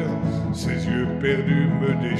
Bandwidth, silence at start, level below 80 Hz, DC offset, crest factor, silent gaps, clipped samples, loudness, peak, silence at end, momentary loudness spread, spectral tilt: 11.5 kHz; 0 s; -42 dBFS; under 0.1%; 14 dB; none; under 0.1%; -23 LUFS; -8 dBFS; 0 s; 5 LU; -7.5 dB/octave